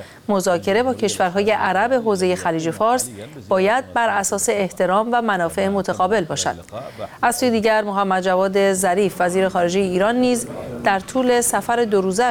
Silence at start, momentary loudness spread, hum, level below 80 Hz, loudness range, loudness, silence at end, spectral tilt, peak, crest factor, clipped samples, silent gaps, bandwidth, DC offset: 0 s; 5 LU; none; -52 dBFS; 2 LU; -19 LUFS; 0 s; -4 dB/octave; -4 dBFS; 16 dB; under 0.1%; none; 19 kHz; under 0.1%